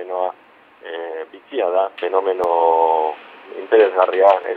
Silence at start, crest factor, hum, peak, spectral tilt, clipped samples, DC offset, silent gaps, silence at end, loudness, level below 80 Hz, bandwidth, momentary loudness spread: 0 s; 18 dB; none; 0 dBFS; -5 dB/octave; under 0.1%; under 0.1%; none; 0 s; -18 LUFS; -70 dBFS; 4.7 kHz; 18 LU